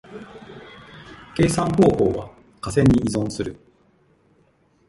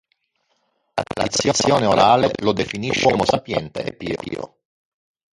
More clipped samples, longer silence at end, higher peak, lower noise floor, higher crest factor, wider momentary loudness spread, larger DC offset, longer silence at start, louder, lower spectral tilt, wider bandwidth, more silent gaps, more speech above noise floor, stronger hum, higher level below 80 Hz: neither; first, 1.35 s vs 0.9 s; about the same, -2 dBFS vs -2 dBFS; second, -60 dBFS vs -69 dBFS; about the same, 20 dB vs 20 dB; first, 24 LU vs 14 LU; neither; second, 0.1 s vs 0.95 s; about the same, -20 LUFS vs -19 LUFS; first, -6.5 dB/octave vs -4 dB/octave; about the same, 11.5 kHz vs 11.5 kHz; neither; second, 41 dB vs 50 dB; neither; first, -42 dBFS vs -50 dBFS